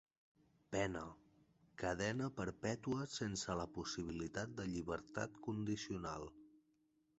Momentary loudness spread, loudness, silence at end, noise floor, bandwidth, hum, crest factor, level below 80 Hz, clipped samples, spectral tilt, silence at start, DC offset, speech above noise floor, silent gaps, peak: 6 LU; -44 LUFS; 0.65 s; -79 dBFS; 8.2 kHz; none; 20 dB; -64 dBFS; under 0.1%; -5 dB/octave; 0.7 s; under 0.1%; 36 dB; none; -24 dBFS